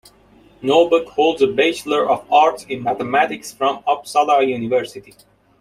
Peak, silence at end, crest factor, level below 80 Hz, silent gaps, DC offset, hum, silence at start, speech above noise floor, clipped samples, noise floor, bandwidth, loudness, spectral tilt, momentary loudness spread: -2 dBFS; 0.6 s; 16 dB; -60 dBFS; none; under 0.1%; none; 0.6 s; 33 dB; under 0.1%; -50 dBFS; 15 kHz; -17 LUFS; -4 dB/octave; 7 LU